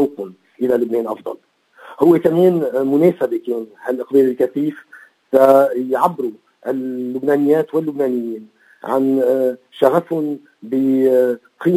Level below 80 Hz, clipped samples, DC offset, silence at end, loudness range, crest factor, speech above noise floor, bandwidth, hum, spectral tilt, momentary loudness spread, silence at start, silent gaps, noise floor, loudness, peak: -68 dBFS; under 0.1%; under 0.1%; 0 s; 3 LU; 16 dB; 26 dB; 16 kHz; none; -8 dB/octave; 13 LU; 0 s; none; -42 dBFS; -17 LUFS; 0 dBFS